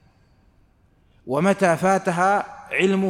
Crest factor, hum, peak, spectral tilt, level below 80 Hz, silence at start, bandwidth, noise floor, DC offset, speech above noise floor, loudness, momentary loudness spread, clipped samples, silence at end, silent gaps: 16 dB; none; -6 dBFS; -5.5 dB/octave; -60 dBFS; 1.25 s; 14 kHz; -59 dBFS; under 0.1%; 39 dB; -21 LUFS; 6 LU; under 0.1%; 0 s; none